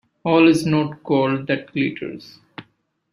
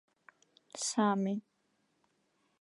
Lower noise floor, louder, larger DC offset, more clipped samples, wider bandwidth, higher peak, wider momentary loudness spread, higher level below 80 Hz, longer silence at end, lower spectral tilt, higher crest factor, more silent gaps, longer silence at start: second, -62 dBFS vs -77 dBFS; first, -19 LUFS vs -33 LUFS; neither; neither; about the same, 12 kHz vs 11.5 kHz; first, -2 dBFS vs -18 dBFS; first, 22 LU vs 12 LU; first, -60 dBFS vs under -90 dBFS; second, 0.5 s vs 1.2 s; first, -6.5 dB/octave vs -4.5 dB/octave; about the same, 18 dB vs 20 dB; neither; second, 0.25 s vs 0.75 s